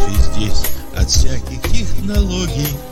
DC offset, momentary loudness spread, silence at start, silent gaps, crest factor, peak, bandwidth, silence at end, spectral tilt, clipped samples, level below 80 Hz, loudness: under 0.1%; 6 LU; 0 s; none; 12 dB; 0 dBFS; 15.5 kHz; 0 s; -4.5 dB/octave; under 0.1%; -18 dBFS; -19 LUFS